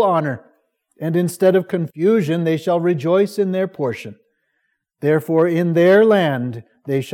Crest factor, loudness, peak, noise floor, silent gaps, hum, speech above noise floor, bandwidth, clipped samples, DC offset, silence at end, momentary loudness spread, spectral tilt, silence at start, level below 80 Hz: 16 dB; -18 LUFS; -2 dBFS; -71 dBFS; none; none; 54 dB; 17 kHz; under 0.1%; under 0.1%; 0 s; 14 LU; -7 dB/octave; 0 s; -72 dBFS